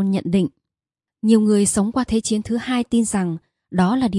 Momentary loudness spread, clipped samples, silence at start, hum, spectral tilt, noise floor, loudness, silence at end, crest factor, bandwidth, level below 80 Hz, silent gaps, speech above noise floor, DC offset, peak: 10 LU; under 0.1%; 0 s; none; -5.5 dB/octave; -89 dBFS; -20 LUFS; 0 s; 16 dB; 11.5 kHz; -48 dBFS; none; 71 dB; under 0.1%; -4 dBFS